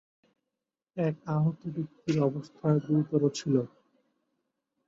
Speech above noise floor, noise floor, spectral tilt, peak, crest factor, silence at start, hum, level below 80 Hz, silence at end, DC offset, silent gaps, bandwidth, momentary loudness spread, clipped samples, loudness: 60 dB; -88 dBFS; -7.5 dB/octave; -12 dBFS; 18 dB; 0.95 s; none; -70 dBFS; 1.2 s; under 0.1%; none; 7.8 kHz; 10 LU; under 0.1%; -30 LUFS